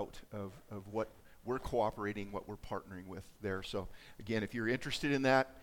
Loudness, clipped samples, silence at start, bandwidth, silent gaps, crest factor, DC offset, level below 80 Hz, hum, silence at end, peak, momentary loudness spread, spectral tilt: -38 LUFS; under 0.1%; 0 s; 18 kHz; none; 22 dB; under 0.1%; -58 dBFS; none; 0 s; -16 dBFS; 16 LU; -5.5 dB/octave